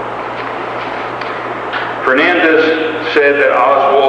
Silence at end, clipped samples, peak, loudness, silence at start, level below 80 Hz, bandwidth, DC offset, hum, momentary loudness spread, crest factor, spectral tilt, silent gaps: 0 s; under 0.1%; 0 dBFS; -13 LUFS; 0 s; -52 dBFS; 9.4 kHz; under 0.1%; 60 Hz at -40 dBFS; 11 LU; 12 dB; -5.5 dB/octave; none